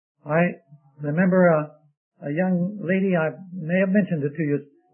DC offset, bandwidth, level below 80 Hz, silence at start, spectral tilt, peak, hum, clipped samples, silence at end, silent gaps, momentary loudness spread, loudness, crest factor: under 0.1%; 3.2 kHz; -72 dBFS; 0.25 s; -13 dB/octave; -6 dBFS; none; under 0.1%; 0.3 s; 1.97-2.12 s; 14 LU; -23 LUFS; 16 dB